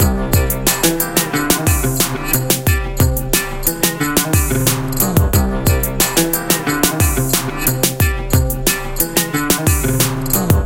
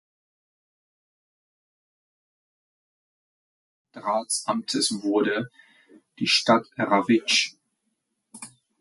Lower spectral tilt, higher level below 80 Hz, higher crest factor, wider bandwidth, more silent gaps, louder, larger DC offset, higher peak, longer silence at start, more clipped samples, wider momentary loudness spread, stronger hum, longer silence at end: about the same, -4 dB/octave vs -3 dB/octave; first, -24 dBFS vs -76 dBFS; second, 16 dB vs 22 dB; first, 17.5 kHz vs 11.5 kHz; neither; first, -15 LUFS vs -23 LUFS; neither; first, 0 dBFS vs -6 dBFS; second, 0 s vs 3.95 s; neither; second, 3 LU vs 20 LU; neither; second, 0 s vs 0.35 s